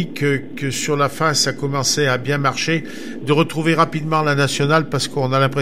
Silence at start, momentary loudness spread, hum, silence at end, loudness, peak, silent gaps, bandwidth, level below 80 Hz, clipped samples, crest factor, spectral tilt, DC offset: 0 s; 6 LU; none; 0 s; -18 LUFS; -2 dBFS; none; 16 kHz; -56 dBFS; under 0.1%; 18 dB; -4.5 dB/octave; 2%